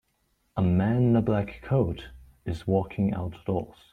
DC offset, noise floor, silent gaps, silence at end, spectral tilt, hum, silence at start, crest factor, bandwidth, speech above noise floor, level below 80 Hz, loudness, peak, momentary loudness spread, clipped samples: under 0.1%; -72 dBFS; none; 0.2 s; -9.5 dB/octave; none; 0.55 s; 16 dB; 9.4 kHz; 46 dB; -48 dBFS; -27 LUFS; -10 dBFS; 13 LU; under 0.1%